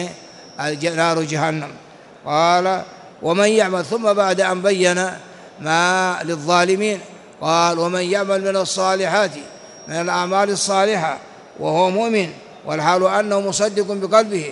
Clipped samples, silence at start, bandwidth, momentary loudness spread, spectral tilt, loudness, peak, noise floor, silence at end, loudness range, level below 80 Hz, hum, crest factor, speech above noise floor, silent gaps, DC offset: under 0.1%; 0 s; 11.5 kHz; 12 LU; -4 dB/octave; -18 LUFS; 0 dBFS; -38 dBFS; 0 s; 2 LU; -66 dBFS; none; 18 dB; 20 dB; none; under 0.1%